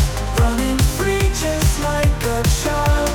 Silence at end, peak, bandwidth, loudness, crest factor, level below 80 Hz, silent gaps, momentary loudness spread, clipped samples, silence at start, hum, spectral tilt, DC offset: 0 s; -6 dBFS; 19.5 kHz; -18 LUFS; 10 dB; -20 dBFS; none; 1 LU; under 0.1%; 0 s; none; -5 dB/octave; under 0.1%